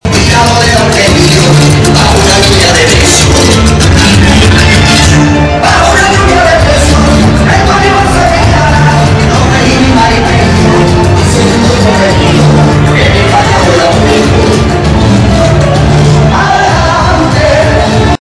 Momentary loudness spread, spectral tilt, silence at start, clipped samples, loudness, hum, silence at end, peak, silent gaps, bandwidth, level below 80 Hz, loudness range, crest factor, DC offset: 3 LU; -4.5 dB/octave; 0.05 s; 2%; -5 LUFS; none; 0.15 s; 0 dBFS; none; 11 kHz; -14 dBFS; 2 LU; 4 dB; under 0.1%